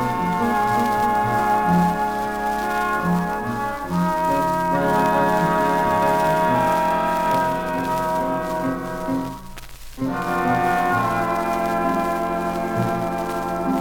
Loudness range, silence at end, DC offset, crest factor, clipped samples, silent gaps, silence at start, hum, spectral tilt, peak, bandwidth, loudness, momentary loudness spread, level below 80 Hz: 4 LU; 0 s; under 0.1%; 16 dB; under 0.1%; none; 0 s; none; -6 dB/octave; -6 dBFS; 19.5 kHz; -21 LUFS; 7 LU; -44 dBFS